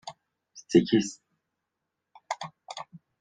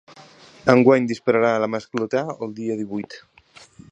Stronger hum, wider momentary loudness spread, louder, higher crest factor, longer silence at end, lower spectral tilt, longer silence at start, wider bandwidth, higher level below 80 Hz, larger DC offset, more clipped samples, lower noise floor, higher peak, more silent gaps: neither; first, 21 LU vs 15 LU; second, -27 LUFS vs -21 LUFS; about the same, 24 dB vs 22 dB; second, 0.25 s vs 0.75 s; second, -5.5 dB/octave vs -7 dB/octave; second, 0.05 s vs 0.65 s; first, 9.4 kHz vs 8.4 kHz; second, -68 dBFS vs -62 dBFS; neither; neither; first, -84 dBFS vs -49 dBFS; second, -8 dBFS vs 0 dBFS; neither